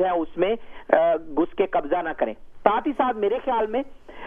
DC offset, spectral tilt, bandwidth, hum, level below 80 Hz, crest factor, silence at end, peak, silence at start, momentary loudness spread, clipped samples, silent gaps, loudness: under 0.1%; -7.5 dB/octave; 3.7 kHz; none; -48 dBFS; 22 dB; 0 s; 0 dBFS; 0 s; 8 LU; under 0.1%; none; -24 LUFS